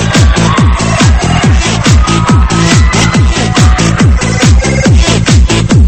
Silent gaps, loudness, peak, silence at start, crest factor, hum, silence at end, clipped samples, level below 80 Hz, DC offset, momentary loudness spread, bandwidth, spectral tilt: none; -7 LUFS; 0 dBFS; 0 s; 6 dB; none; 0 s; 0.5%; -12 dBFS; 1%; 2 LU; 8.8 kHz; -5 dB/octave